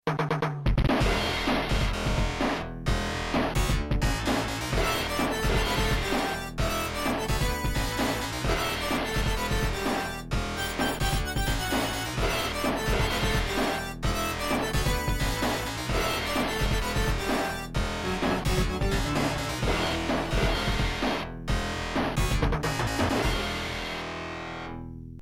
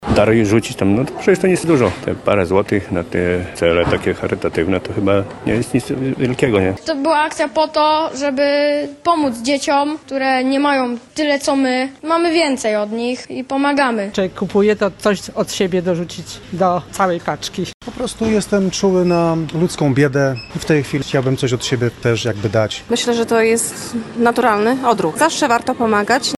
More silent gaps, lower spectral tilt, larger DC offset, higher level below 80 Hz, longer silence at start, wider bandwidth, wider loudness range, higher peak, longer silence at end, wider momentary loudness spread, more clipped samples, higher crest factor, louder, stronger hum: second, none vs 17.74-17.80 s; about the same, -4.5 dB/octave vs -5 dB/octave; neither; first, -34 dBFS vs -44 dBFS; about the same, 0.05 s vs 0 s; first, 17 kHz vs 12.5 kHz; about the same, 1 LU vs 2 LU; second, -14 dBFS vs 0 dBFS; about the same, 0 s vs 0 s; second, 4 LU vs 7 LU; neither; about the same, 14 dB vs 16 dB; second, -28 LUFS vs -17 LUFS; neither